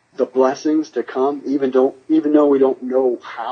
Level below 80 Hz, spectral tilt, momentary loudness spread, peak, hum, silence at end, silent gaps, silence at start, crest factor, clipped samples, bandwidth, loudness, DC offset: -76 dBFS; -6 dB/octave; 7 LU; -2 dBFS; none; 0 s; none; 0.2 s; 16 dB; under 0.1%; 6.8 kHz; -18 LUFS; under 0.1%